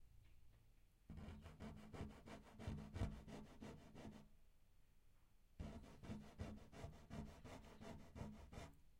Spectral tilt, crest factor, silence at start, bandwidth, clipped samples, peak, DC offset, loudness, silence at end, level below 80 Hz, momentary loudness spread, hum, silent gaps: -6.5 dB/octave; 24 dB; 0 s; 16 kHz; under 0.1%; -34 dBFS; under 0.1%; -57 LUFS; 0 s; -64 dBFS; 9 LU; none; none